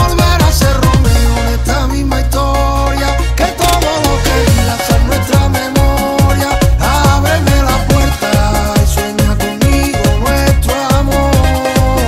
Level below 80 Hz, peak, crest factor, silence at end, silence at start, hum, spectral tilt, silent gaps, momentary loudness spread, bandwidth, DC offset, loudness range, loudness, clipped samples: -14 dBFS; 0 dBFS; 10 dB; 0 s; 0 s; none; -5 dB/octave; none; 4 LU; 16.5 kHz; under 0.1%; 1 LU; -12 LUFS; under 0.1%